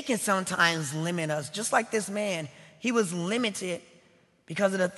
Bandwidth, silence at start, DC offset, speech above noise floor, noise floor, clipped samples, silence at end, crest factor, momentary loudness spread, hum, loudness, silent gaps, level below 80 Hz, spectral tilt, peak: 12.5 kHz; 0 s; under 0.1%; 34 dB; -62 dBFS; under 0.1%; 0 s; 22 dB; 10 LU; none; -28 LUFS; none; -74 dBFS; -3.5 dB/octave; -6 dBFS